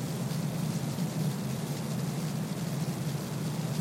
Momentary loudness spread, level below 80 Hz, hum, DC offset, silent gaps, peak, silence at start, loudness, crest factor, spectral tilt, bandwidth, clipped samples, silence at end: 2 LU; -62 dBFS; none; under 0.1%; none; -20 dBFS; 0 s; -33 LUFS; 12 dB; -6 dB/octave; 16.5 kHz; under 0.1%; 0 s